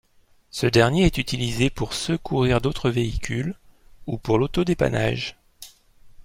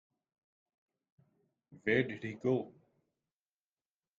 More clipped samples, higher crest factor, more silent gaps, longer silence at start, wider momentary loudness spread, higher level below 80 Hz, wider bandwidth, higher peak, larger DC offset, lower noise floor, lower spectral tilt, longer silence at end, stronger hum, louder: neither; about the same, 20 dB vs 24 dB; neither; second, 0.55 s vs 1.7 s; first, 20 LU vs 8 LU; first, -38 dBFS vs -76 dBFS; first, 16 kHz vs 7.4 kHz; first, -2 dBFS vs -18 dBFS; neither; second, -57 dBFS vs under -90 dBFS; second, -5.5 dB/octave vs -7.5 dB/octave; second, 0.05 s vs 1.5 s; neither; first, -23 LUFS vs -35 LUFS